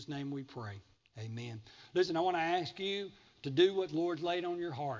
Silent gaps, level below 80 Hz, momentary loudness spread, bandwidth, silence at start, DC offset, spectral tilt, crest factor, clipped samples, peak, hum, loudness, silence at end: none; -72 dBFS; 17 LU; 7.6 kHz; 0 s; under 0.1%; -6 dB/octave; 20 dB; under 0.1%; -16 dBFS; none; -35 LUFS; 0 s